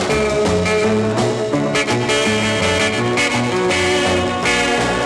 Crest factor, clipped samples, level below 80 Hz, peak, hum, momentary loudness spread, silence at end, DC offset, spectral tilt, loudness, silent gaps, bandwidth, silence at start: 12 dB; under 0.1%; -40 dBFS; -4 dBFS; none; 2 LU; 0 s; under 0.1%; -4 dB/octave; -16 LUFS; none; 12.5 kHz; 0 s